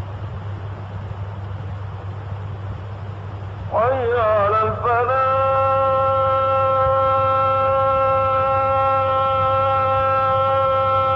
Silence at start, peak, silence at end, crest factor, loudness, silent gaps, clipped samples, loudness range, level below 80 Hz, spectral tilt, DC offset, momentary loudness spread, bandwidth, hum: 0 s; -10 dBFS; 0 s; 10 dB; -17 LUFS; none; under 0.1%; 12 LU; -42 dBFS; -8 dB/octave; under 0.1%; 14 LU; 5.8 kHz; none